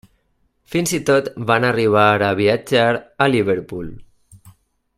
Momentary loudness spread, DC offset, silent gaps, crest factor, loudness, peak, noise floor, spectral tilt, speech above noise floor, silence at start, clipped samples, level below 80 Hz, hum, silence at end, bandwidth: 10 LU; under 0.1%; none; 18 dB; -17 LUFS; 0 dBFS; -64 dBFS; -5 dB/octave; 47 dB; 0.7 s; under 0.1%; -52 dBFS; none; 0.5 s; 15.5 kHz